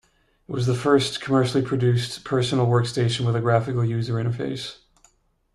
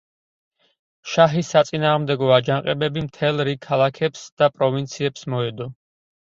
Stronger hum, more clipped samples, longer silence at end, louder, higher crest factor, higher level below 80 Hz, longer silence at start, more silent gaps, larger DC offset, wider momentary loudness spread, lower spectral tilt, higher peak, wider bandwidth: neither; neither; first, 0.8 s vs 0.65 s; second, -23 LUFS vs -20 LUFS; about the same, 18 dB vs 22 dB; about the same, -54 dBFS vs -58 dBFS; second, 0.5 s vs 1.05 s; second, none vs 4.32-4.37 s; neither; about the same, 8 LU vs 8 LU; about the same, -6.5 dB/octave vs -5.5 dB/octave; second, -4 dBFS vs 0 dBFS; first, 12 kHz vs 7.8 kHz